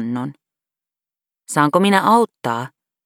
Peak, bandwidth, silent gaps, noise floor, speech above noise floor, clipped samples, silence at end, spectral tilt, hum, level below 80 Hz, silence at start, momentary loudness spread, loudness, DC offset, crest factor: 0 dBFS; 19 kHz; none; -90 dBFS; 73 dB; under 0.1%; 0.4 s; -5 dB/octave; none; -70 dBFS; 0 s; 14 LU; -17 LUFS; under 0.1%; 18 dB